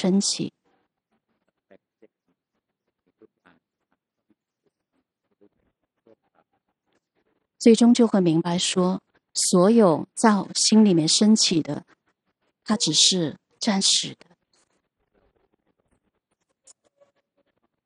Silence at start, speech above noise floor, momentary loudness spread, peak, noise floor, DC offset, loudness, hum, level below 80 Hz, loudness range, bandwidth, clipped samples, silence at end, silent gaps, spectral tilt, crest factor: 0 s; 61 dB; 13 LU; -4 dBFS; -81 dBFS; under 0.1%; -20 LUFS; none; -74 dBFS; 8 LU; 11 kHz; under 0.1%; 3.75 s; none; -4 dB/octave; 20 dB